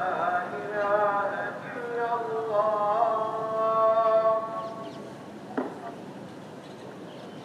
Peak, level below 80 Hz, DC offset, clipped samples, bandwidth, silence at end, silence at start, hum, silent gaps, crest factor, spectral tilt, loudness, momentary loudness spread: -12 dBFS; -78 dBFS; under 0.1%; under 0.1%; 11 kHz; 0 s; 0 s; none; none; 16 dB; -6 dB/octave; -27 LUFS; 19 LU